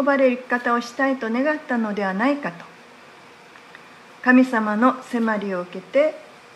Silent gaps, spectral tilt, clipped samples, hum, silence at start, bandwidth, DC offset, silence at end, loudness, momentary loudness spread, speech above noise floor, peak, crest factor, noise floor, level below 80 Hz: none; -6 dB/octave; under 0.1%; none; 0 s; 11.5 kHz; under 0.1%; 0.35 s; -21 LUFS; 11 LU; 25 dB; -4 dBFS; 18 dB; -46 dBFS; -76 dBFS